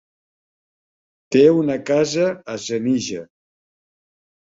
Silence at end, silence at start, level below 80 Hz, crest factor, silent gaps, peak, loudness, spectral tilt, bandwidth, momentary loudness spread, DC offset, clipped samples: 1.25 s; 1.3 s; -62 dBFS; 20 dB; none; -2 dBFS; -19 LUFS; -5.5 dB/octave; 7.8 kHz; 14 LU; under 0.1%; under 0.1%